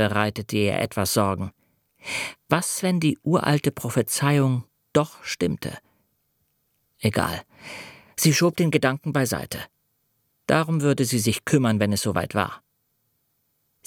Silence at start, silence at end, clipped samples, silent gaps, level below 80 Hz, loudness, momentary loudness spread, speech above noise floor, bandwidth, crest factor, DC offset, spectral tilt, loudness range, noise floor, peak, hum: 0 s; 1.3 s; under 0.1%; none; -56 dBFS; -23 LUFS; 15 LU; 49 dB; 18.5 kHz; 22 dB; under 0.1%; -5 dB/octave; 3 LU; -71 dBFS; -2 dBFS; none